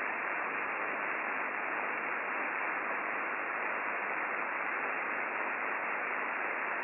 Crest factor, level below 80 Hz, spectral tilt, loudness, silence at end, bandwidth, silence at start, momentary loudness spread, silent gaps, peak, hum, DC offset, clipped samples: 14 dB; -88 dBFS; -1 dB/octave; -34 LUFS; 0 s; 3.3 kHz; 0 s; 1 LU; none; -20 dBFS; none; under 0.1%; under 0.1%